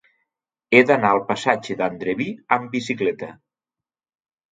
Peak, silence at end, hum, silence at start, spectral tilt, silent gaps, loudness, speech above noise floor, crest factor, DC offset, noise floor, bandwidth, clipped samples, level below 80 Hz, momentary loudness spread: 0 dBFS; 1.2 s; none; 0.7 s; -5.5 dB/octave; none; -20 LUFS; 70 dB; 22 dB; under 0.1%; -90 dBFS; 9.2 kHz; under 0.1%; -64 dBFS; 11 LU